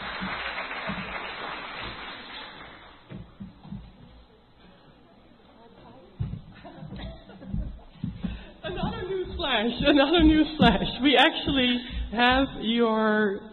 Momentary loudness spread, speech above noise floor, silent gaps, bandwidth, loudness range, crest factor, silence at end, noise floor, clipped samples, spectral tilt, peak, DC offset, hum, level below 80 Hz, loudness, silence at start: 23 LU; 32 dB; none; 6 kHz; 22 LU; 20 dB; 0 s; -54 dBFS; under 0.1%; -3 dB/octave; -6 dBFS; under 0.1%; none; -42 dBFS; -25 LUFS; 0 s